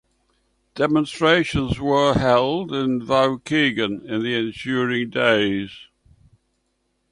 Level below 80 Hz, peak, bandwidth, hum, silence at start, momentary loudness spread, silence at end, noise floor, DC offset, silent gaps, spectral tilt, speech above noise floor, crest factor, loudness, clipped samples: -46 dBFS; -4 dBFS; 11 kHz; none; 0.75 s; 7 LU; 1.3 s; -71 dBFS; under 0.1%; none; -5.5 dB/octave; 50 dB; 18 dB; -20 LUFS; under 0.1%